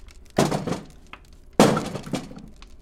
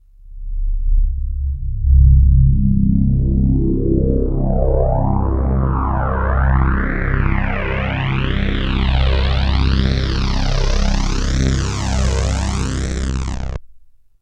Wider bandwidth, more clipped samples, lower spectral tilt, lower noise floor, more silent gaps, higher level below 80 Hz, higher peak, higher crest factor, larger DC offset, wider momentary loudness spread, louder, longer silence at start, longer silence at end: first, 16.5 kHz vs 9 kHz; neither; second, -5 dB/octave vs -6.5 dB/octave; about the same, -46 dBFS vs -43 dBFS; neither; second, -46 dBFS vs -18 dBFS; about the same, 0 dBFS vs 0 dBFS; first, 24 dB vs 14 dB; neither; first, 23 LU vs 9 LU; second, -24 LUFS vs -18 LUFS; about the same, 0.35 s vs 0.25 s; second, 0.15 s vs 0.45 s